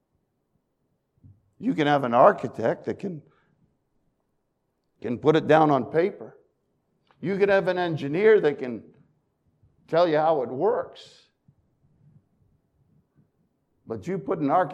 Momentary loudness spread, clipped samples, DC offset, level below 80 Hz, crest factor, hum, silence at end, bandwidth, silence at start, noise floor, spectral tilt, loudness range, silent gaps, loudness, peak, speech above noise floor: 17 LU; under 0.1%; under 0.1%; -70 dBFS; 24 dB; none; 0 s; 8.4 kHz; 1.6 s; -75 dBFS; -7.5 dB/octave; 7 LU; none; -23 LUFS; -2 dBFS; 52 dB